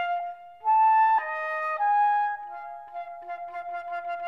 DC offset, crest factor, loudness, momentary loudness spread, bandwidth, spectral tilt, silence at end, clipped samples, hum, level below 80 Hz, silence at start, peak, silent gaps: under 0.1%; 12 dB; -25 LUFS; 18 LU; 5.2 kHz; -2.5 dB/octave; 0 s; under 0.1%; none; -78 dBFS; 0 s; -14 dBFS; none